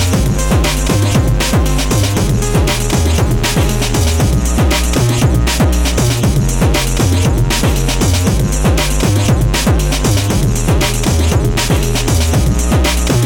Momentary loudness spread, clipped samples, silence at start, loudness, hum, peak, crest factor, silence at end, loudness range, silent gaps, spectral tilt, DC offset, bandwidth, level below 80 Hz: 1 LU; under 0.1%; 0 s; -13 LUFS; none; -2 dBFS; 8 dB; 0 s; 0 LU; none; -5 dB/octave; under 0.1%; 18.5 kHz; -16 dBFS